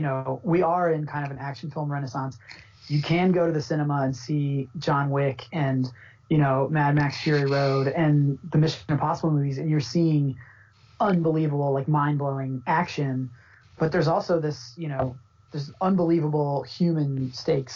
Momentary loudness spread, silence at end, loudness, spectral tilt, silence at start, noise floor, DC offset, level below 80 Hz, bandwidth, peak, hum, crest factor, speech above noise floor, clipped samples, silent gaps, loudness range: 10 LU; 0 s; -25 LUFS; -6.5 dB/octave; 0 s; -54 dBFS; under 0.1%; -58 dBFS; 7.2 kHz; -12 dBFS; none; 12 dB; 30 dB; under 0.1%; none; 3 LU